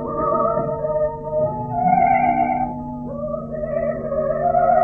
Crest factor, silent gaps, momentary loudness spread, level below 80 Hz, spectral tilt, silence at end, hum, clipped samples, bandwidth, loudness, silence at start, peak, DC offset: 16 dB; none; 11 LU; -42 dBFS; -11 dB/octave; 0 s; none; under 0.1%; 3 kHz; -21 LUFS; 0 s; -4 dBFS; under 0.1%